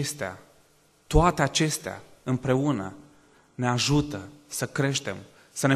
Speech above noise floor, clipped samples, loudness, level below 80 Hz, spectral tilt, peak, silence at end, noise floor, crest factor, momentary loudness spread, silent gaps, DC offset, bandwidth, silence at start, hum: 35 dB; under 0.1%; -26 LUFS; -40 dBFS; -4.5 dB/octave; -6 dBFS; 0 s; -61 dBFS; 20 dB; 16 LU; none; under 0.1%; 13 kHz; 0 s; none